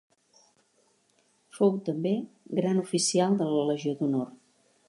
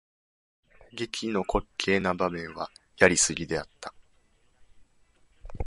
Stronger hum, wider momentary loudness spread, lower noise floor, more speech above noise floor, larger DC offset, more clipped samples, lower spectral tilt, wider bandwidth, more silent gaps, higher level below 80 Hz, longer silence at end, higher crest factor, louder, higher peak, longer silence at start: neither; second, 7 LU vs 20 LU; first, -68 dBFS vs -64 dBFS; first, 42 dB vs 37 dB; neither; neither; first, -5.5 dB/octave vs -3 dB/octave; about the same, 11.5 kHz vs 11.5 kHz; neither; second, -80 dBFS vs -48 dBFS; first, 0.55 s vs 0 s; second, 18 dB vs 28 dB; about the same, -28 LUFS vs -27 LUFS; second, -12 dBFS vs -2 dBFS; first, 1.55 s vs 0.95 s